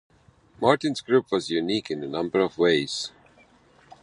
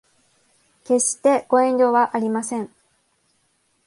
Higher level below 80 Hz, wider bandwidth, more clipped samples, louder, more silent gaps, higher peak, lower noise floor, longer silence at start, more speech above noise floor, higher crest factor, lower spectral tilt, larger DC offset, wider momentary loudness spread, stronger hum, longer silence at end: first, -64 dBFS vs -72 dBFS; about the same, 11.5 kHz vs 11.5 kHz; neither; second, -24 LUFS vs -19 LUFS; neither; first, -2 dBFS vs -6 dBFS; second, -57 dBFS vs -66 dBFS; second, 0.6 s vs 0.9 s; second, 33 dB vs 47 dB; first, 24 dB vs 16 dB; about the same, -4.5 dB/octave vs -3.5 dB/octave; neither; second, 8 LU vs 11 LU; neither; second, 0.95 s vs 1.2 s